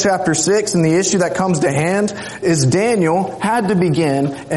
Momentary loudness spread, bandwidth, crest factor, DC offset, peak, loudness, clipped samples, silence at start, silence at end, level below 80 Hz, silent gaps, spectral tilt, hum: 4 LU; 11.5 kHz; 12 dB; under 0.1%; -4 dBFS; -16 LUFS; under 0.1%; 0 s; 0 s; -52 dBFS; none; -5 dB/octave; none